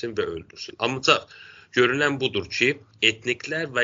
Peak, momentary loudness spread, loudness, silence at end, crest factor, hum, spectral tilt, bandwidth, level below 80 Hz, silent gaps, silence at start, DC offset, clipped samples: -2 dBFS; 9 LU; -23 LUFS; 0 s; 22 dB; none; -1.5 dB/octave; 7.8 kHz; -60 dBFS; none; 0 s; under 0.1%; under 0.1%